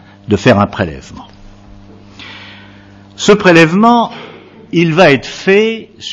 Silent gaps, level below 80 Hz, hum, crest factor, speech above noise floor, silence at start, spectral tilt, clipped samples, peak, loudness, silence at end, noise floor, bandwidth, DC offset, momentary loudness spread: none; -42 dBFS; none; 12 dB; 28 dB; 0.3 s; -5.5 dB/octave; 0.4%; 0 dBFS; -10 LUFS; 0 s; -38 dBFS; 11 kHz; under 0.1%; 23 LU